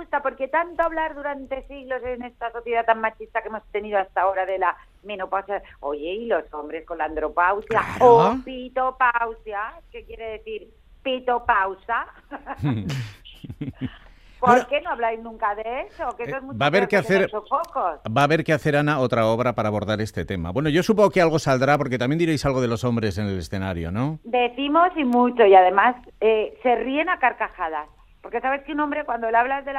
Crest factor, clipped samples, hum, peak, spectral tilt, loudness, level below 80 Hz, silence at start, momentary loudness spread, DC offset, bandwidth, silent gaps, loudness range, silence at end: 22 dB; under 0.1%; none; -2 dBFS; -6 dB/octave; -22 LUFS; -50 dBFS; 0 s; 14 LU; under 0.1%; 15 kHz; none; 7 LU; 0 s